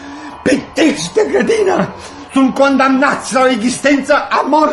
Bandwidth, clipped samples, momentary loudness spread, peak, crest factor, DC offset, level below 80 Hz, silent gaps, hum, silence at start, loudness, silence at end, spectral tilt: 11.5 kHz; under 0.1%; 7 LU; 0 dBFS; 12 dB; under 0.1%; -48 dBFS; none; none; 0 s; -13 LUFS; 0 s; -4 dB/octave